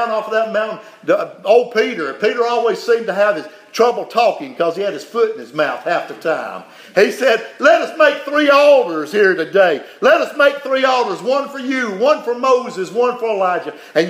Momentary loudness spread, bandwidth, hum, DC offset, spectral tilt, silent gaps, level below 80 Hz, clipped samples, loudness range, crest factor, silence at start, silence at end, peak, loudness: 8 LU; 15.5 kHz; none; under 0.1%; -4 dB/octave; none; -74 dBFS; under 0.1%; 5 LU; 16 dB; 0 s; 0 s; 0 dBFS; -16 LUFS